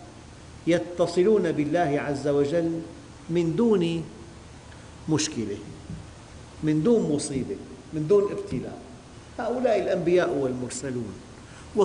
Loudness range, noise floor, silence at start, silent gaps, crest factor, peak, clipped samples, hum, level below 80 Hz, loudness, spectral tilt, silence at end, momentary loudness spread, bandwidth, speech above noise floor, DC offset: 4 LU; -45 dBFS; 0 s; none; 14 dB; -12 dBFS; under 0.1%; none; -52 dBFS; -25 LUFS; -6 dB/octave; 0 s; 22 LU; 10.5 kHz; 20 dB; under 0.1%